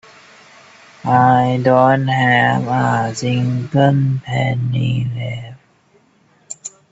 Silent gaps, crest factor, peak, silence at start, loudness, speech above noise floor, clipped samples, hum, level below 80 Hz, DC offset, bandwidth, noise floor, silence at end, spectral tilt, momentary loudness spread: none; 16 dB; 0 dBFS; 1.05 s; -16 LUFS; 40 dB; under 0.1%; none; -52 dBFS; under 0.1%; 8 kHz; -55 dBFS; 0.25 s; -6.5 dB/octave; 17 LU